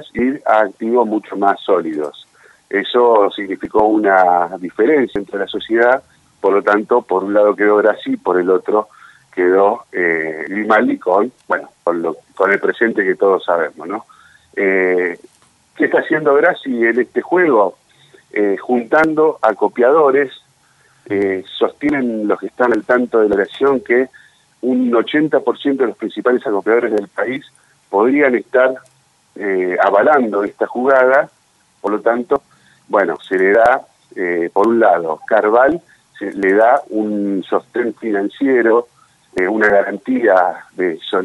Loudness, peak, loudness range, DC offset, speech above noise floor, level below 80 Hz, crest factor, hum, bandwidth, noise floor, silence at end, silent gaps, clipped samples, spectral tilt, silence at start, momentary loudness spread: -15 LUFS; 0 dBFS; 2 LU; under 0.1%; 39 dB; -58 dBFS; 14 dB; none; 11.5 kHz; -54 dBFS; 0 s; none; under 0.1%; -6.5 dB/octave; 0 s; 9 LU